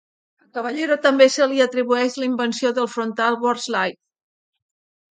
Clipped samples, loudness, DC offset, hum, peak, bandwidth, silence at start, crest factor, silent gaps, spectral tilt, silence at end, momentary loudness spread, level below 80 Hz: under 0.1%; -20 LUFS; under 0.1%; none; 0 dBFS; 9.4 kHz; 0.55 s; 20 dB; none; -3 dB/octave; 1.2 s; 10 LU; -76 dBFS